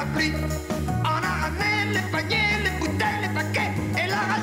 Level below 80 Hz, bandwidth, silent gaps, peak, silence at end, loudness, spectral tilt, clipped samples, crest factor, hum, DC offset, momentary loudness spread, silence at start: -40 dBFS; 16 kHz; none; -10 dBFS; 0 s; -24 LUFS; -5 dB/octave; under 0.1%; 14 dB; none; under 0.1%; 4 LU; 0 s